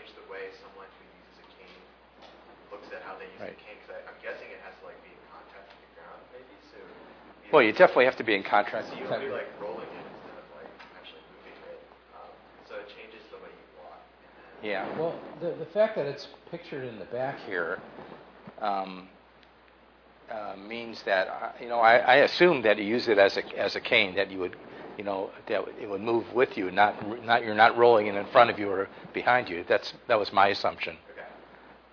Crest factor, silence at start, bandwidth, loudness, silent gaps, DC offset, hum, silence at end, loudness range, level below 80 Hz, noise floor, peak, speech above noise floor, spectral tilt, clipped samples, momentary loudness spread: 24 dB; 0.05 s; 5.4 kHz; -26 LUFS; none; under 0.1%; none; 0.55 s; 23 LU; -68 dBFS; -57 dBFS; -4 dBFS; 31 dB; -5.5 dB/octave; under 0.1%; 26 LU